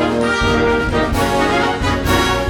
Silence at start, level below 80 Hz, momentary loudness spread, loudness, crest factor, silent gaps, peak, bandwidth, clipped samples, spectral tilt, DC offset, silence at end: 0 s; -26 dBFS; 2 LU; -16 LUFS; 14 dB; none; -2 dBFS; over 20 kHz; under 0.1%; -5 dB/octave; under 0.1%; 0 s